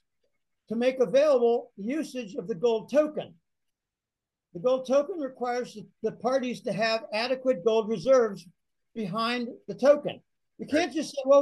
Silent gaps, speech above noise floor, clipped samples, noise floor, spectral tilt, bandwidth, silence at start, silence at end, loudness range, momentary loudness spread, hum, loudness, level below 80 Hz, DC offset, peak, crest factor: none; 63 dB; under 0.1%; -89 dBFS; -5 dB/octave; 12 kHz; 0.7 s; 0 s; 4 LU; 14 LU; none; -27 LUFS; -72 dBFS; under 0.1%; -8 dBFS; 18 dB